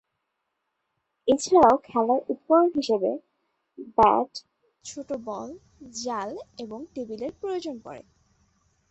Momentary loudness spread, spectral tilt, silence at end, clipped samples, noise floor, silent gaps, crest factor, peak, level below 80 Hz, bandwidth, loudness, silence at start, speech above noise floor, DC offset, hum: 21 LU; -4.5 dB/octave; 0.9 s; under 0.1%; -79 dBFS; none; 22 dB; -4 dBFS; -58 dBFS; 8.4 kHz; -24 LUFS; 1.25 s; 55 dB; under 0.1%; none